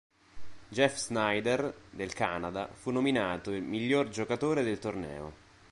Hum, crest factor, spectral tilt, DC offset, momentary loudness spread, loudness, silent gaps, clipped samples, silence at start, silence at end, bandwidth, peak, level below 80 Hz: none; 20 dB; -4.5 dB/octave; under 0.1%; 11 LU; -32 LUFS; none; under 0.1%; 0.35 s; 0.35 s; 11.5 kHz; -12 dBFS; -60 dBFS